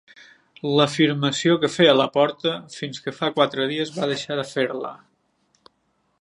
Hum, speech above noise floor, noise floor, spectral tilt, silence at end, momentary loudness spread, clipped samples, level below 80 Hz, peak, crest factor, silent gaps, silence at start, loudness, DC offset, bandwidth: none; 47 dB; -69 dBFS; -5 dB/octave; 1.25 s; 14 LU; under 0.1%; -70 dBFS; -2 dBFS; 20 dB; none; 0.65 s; -21 LUFS; under 0.1%; 11.5 kHz